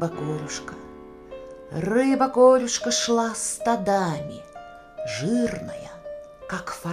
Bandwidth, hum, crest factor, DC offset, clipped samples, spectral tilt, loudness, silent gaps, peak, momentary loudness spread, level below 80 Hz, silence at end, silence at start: 15 kHz; none; 20 dB; under 0.1%; under 0.1%; -4 dB/octave; -23 LUFS; none; -4 dBFS; 23 LU; -54 dBFS; 0 s; 0 s